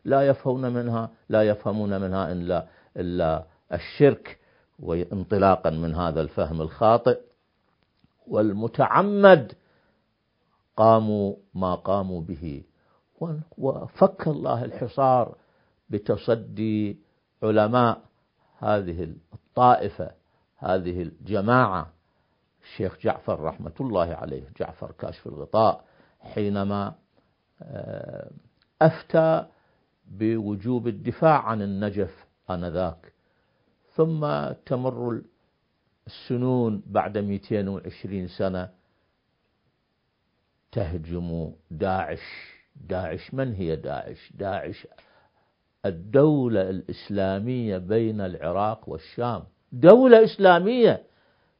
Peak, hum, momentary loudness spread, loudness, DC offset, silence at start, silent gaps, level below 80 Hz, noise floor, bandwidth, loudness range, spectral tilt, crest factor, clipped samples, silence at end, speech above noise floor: 0 dBFS; none; 16 LU; -24 LUFS; under 0.1%; 0.05 s; none; -48 dBFS; -73 dBFS; 5.4 kHz; 10 LU; -11 dB/octave; 24 dB; under 0.1%; 0.6 s; 50 dB